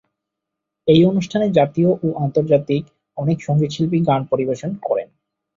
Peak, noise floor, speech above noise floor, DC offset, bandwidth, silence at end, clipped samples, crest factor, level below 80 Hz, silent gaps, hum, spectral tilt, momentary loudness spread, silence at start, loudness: -2 dBFS; -81 dBFS; 64 dB; under 0.1%; 7.6 kHz; 0.5 s; under 0.1%; 16 dB; -56 dBFS; none; none; -8 dB/octave; 10 LU; 0.85 s; -18 LUFS